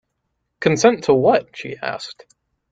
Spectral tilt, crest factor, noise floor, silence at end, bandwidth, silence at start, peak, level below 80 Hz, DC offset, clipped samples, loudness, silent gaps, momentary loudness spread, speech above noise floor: -5 dB/octave; 18 dB; -74 dBFS; 0.6 s; 9 kHz; 0.6 s; -2 dBFS; -60 dBFS; under 0.1%; under 0.1%; -18 LUFS; none; 16 LU; 56 dB